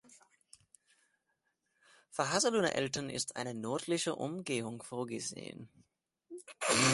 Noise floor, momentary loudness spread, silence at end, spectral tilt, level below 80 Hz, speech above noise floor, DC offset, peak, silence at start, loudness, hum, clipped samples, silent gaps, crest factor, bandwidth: -82 dBFS; 18 LU; 0 s; -3 dB/octave; -72 dBFS; 46 dB; under 0.1%; -14 dBFS; 0.1 s; -35 LUFS; none; under 0.1%; none; 22 dB; 12 kHz